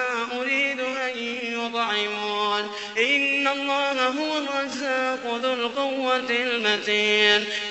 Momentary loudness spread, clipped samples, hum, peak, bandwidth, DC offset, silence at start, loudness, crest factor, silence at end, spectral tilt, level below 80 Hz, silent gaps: 8 LU; under 0.1%; none; -4 dBFS; 8.4 kHz; under 0.1%; 0 s; -23 LUFS; 20 dB; 0 s; -2 dB/octave; -70 dBFS; none